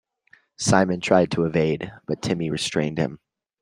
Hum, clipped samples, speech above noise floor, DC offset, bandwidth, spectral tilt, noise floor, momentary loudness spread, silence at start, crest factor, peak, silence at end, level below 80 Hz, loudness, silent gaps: none; under 0.1%; 36 dB; under 0.1%; 12 kHz; -5 dB/octave; -58 dBFS; 9 LU; 0.6 s; 22 dB; -2 dBFS; 0.45 s; -54 dBFS; -23 LUFS; none